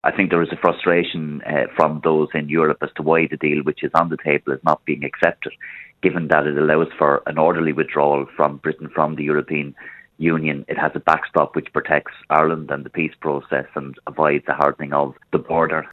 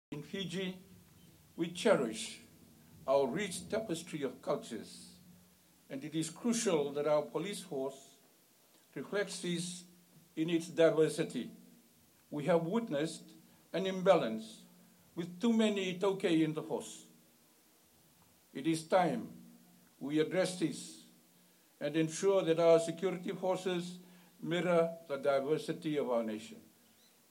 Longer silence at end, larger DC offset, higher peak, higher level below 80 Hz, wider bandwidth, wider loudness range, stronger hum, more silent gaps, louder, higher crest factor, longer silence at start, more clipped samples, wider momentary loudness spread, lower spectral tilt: second, 0 s vs 0.7 s; neither; first, 0 dBFS vs -14 dBFS; first, -56 dBFS vs -80 dBFS; second, 7.2 kHz vs 16.5 kHz; about the same, 3 LU vs 5 LU; neither; neither; first, -19 LUFS vs -35 LUFS; about the same, 20 dB vs 22 dB; about the same, 0.05 s vs 0.1 s; neither; second, 8 LU vs 19 LU; first, -8 dB/octave vs -5 dB/octave